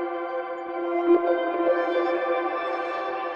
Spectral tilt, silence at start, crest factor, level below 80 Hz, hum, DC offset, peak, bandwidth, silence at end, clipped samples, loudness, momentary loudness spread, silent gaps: -5.5 dB/octave; 0 s; 16 dB; -72 dBFS; none; under 0.1%; -10 dBFS; 5.8 kHz; 0 s; under 0.1%; -25 LUFS; 9 LU; none